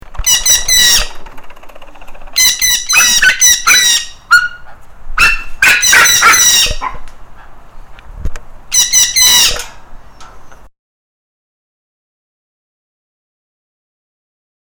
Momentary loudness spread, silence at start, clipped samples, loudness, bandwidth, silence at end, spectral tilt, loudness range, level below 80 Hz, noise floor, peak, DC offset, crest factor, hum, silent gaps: 17 LU; 0.1 s; 0.2%; -7 LUFS; over 20 kHz; 4.05 s; 2 dB/octave; 3 LU; -28 dBFS; -31 dBFS; 0 dBFS; under 0.1%; 12 dB; none; none